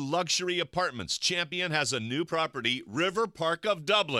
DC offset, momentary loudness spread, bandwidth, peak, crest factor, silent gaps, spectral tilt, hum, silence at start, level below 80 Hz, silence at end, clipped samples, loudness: under 0.1%; 3 LU; 15.5 kHz; -10 dBFS; 18 dB; none; -3 dB/octave; none; 0 s; -66 dBFS; 0 s; under 0.1%; -29 LUFS